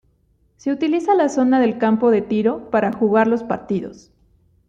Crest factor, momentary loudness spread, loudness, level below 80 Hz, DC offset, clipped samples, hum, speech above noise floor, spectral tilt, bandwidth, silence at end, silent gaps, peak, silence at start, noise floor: 16 dB; 9 LU; -18 LUFS; -58 dBFS; under 0.1%; under 0.1%; none; 43 dB; -6.5 dB/octave; 8 kHz; 0.75 s; none; -4 dBFS; 0.65 s; -61 dBFS